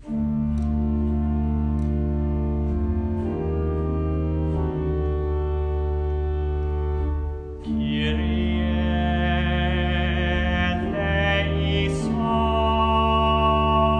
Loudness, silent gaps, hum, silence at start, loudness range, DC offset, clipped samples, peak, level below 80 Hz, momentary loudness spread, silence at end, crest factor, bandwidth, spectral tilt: -23 LUFS; none; none; 0 s; 4 LU; under 0.1%; under 0.1%; -8 dBFS; -26 dBFS; 6 LU; 0 s; 14 dB; 9 kHz; -7.5 dB/octave